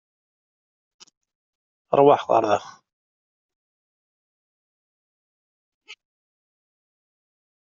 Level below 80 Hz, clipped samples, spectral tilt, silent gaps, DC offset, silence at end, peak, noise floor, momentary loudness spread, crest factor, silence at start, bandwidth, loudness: -72 dBFS; under 0.1%; -4.5 dB/octave; 2.93-3.49 s, 3.55-5.81 s; under 0.1%; 1.7 s; -2 dBFS; under -90 dBFS; 8 LU; 26 dB; 1.9 s; 7.4 kHz; -19 LUFS